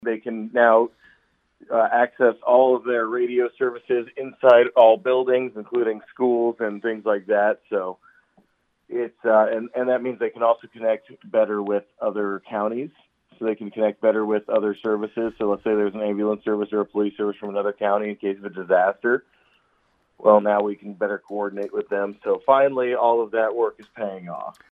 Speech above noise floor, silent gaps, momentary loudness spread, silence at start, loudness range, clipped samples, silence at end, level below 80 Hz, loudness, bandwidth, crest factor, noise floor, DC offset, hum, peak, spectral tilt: 45 dB; none; 11 LU; 0 s; 5 LU; under 0.1%; 0.2 s; -70 dBFS; -22 LUFS; 4 kHz; 20 dB; -66 dBFS; under 0.1%; none; -2 dBFS; -8 dB/octave